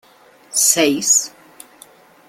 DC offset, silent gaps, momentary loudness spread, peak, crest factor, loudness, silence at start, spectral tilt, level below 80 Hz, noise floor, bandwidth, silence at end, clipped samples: under 0.1%; none; 9 LU; 0 dBFS; 20 dB; -14 LUFS; 0.55 s; -1 dB/octave; -66 dBFS; -48 dBFS; 16.5 kHz; 1 s; under 0.1%